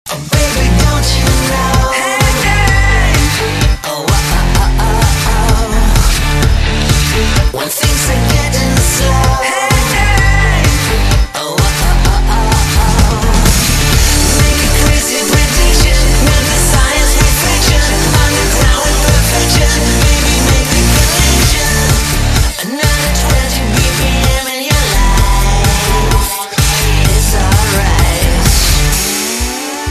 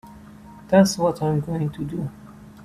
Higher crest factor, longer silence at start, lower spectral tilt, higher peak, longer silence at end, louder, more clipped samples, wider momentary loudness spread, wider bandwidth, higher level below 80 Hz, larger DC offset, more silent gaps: second, 10 dB vs 20 dB; about the same, 0.05 s vs 0.05 s; second, -3.5 dB/octave vs -6 dB/octave; first, 0 dBFS vs -4 dBFS; about the same, 0 s vs 0 s; first, -11 LUFS vs -22 LUFS; neither; second, 3 LU vs 13 LU; about the same, 14.5 kHz vs 14.5 kHz; first, -12 dBFS vs -52 dBFS; neither; neither